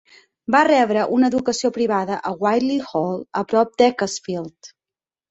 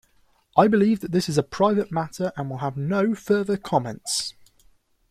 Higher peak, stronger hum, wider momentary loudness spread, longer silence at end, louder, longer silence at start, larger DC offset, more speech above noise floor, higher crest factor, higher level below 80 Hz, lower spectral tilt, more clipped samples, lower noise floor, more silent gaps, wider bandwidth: about the same, -2 dBFS vs -2 dBFS; neither; about the same, 11 LU vs 10 LU; second, 0.65 s vs 0.8 s; first, -19 LUFS vs -23 LUFS; about the same, 0.5 s vs 0.55 s; neither; first, over 71 dB vs 39 dB; about the same, 18 dB vs 22 dB; about the same, -62 dBFS vs -58 dBFS; about the same, -4.5 dB/octave vs -5.5 dB/octave; neither; first, under -90 dBFS vs -62 dBFS; neither; second, 8.2 kHz vs 15 kHz